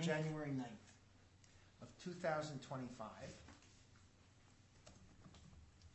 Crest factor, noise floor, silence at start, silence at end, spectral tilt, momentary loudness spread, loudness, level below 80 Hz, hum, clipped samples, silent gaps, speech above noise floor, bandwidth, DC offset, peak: 22 dB; -68 dBFS; 0 s; 0 s; -5.5 dB/octave; 25 LU; -47 LUFS; -74 dBFS; none; under 0.1%; none; 23 dB; 8.2 kHz; under 0.1%; -28 dBFS